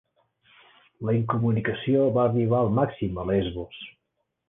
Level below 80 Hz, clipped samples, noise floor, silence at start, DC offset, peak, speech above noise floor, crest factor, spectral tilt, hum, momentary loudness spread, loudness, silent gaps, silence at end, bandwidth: -50 dBFS; under 0.1%; -78 dBFS; 1 s; under 0.1%; -10 dBFS; 54 dB; 16 dB; -11 dB/octave; none; 14 LU; -25 LUFS; none; 0.6 s; 3.8 kHz